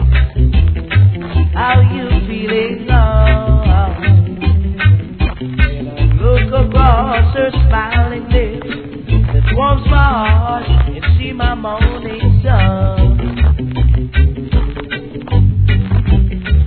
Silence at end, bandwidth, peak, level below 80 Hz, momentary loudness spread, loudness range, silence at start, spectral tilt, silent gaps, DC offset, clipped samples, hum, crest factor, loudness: 0 s; 4.5 kHz; 0 dBFS; -14 dBFS; 6 LU; 1 LU; 0 s; -11 dB/octave; none; 0.3%; under 0.1%; none; 12 dB; -13 LUFS